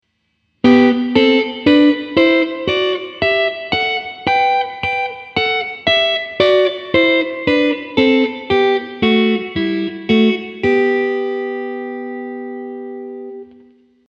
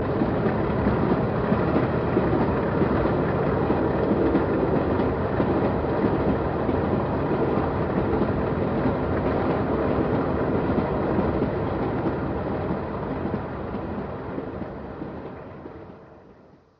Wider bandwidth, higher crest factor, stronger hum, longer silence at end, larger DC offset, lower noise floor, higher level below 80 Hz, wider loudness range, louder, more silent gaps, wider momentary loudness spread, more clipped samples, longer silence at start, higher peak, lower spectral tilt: first, 7.8 kHz vs 5.8 kHz; about the same, 16 dB vs 16 dB; first, 60 Hz at -55 dBFS vs none; first, 0.65 s vs 0.45 s; neither; first, -66 dBFS vs -52 dBFS; second, -50 dBFS vs -38 dBFS; second, 5 LU vs 8 LU; first, -15 LUFS vs -24 LUFS; neither; first, 14 LU vs 10 LU; neither; first, 0.65 s vs 0 s; first, 0 dBFS vs -8 dBFS; second, -6 dB/octave vs -7.5 dB/octave